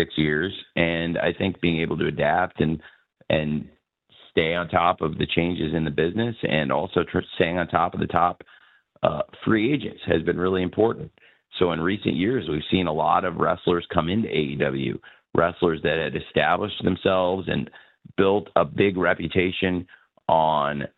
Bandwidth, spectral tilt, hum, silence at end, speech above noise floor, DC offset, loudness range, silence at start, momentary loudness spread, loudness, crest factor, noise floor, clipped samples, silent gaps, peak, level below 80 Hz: 4.5 kHz; -9.5 dB/octave; none; 0.1 s; 33 dB; under 0.1%; 2 LU; 0 s; 6 LU; -23 LUFS; 22 dB; -56 dBFS; under 0.1%; none; -2 dBFS; -48 dBFS